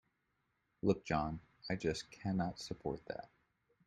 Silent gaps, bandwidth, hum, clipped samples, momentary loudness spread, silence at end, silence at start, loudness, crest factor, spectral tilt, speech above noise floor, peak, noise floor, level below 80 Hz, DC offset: none; 11.5 kHz; none; under 0.1%; 10 LU; 0.6 s; 0.85 s; -40 LUFS; 22 dB; -6 dB/octave; 44 dB; -18 dBFS; -82 dBFS; -62 dBFS; under 0.1%